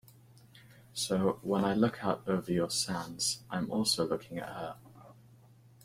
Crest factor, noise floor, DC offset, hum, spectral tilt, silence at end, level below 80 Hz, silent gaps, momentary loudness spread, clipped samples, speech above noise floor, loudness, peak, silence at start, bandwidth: 20 dB; -59 dBFS; under 0.1%; none; -4 dB/octave; 0.7 s; -64 dBFS; none; 12 LU; under 0.1%; 27 dB; -32 LUFS; -14 dBFS; 0.55 s; 16 kHz